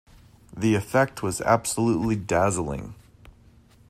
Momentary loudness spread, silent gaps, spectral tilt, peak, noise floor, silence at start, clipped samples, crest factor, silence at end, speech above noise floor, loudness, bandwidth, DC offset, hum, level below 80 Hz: 12 LU; none; -5.5 dB/octave; -6 dBFS; -54 dBFS; 0.55 s; under 0.1%; 20 dB; 0.6 s; 31 dB; -24 LUFS; 15.5 kHz; under 0.1%; none; -50 dBFS